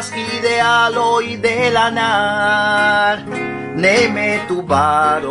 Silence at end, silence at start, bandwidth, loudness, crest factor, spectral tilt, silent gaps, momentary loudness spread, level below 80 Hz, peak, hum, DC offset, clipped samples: 0 s; 0 s; 11 kHz; -15 LUFS; 14 dB; -4 dB/octave; none; 7 LU; -52 dBFS; 0 dBFS; none; under 0.1%; under 0.1%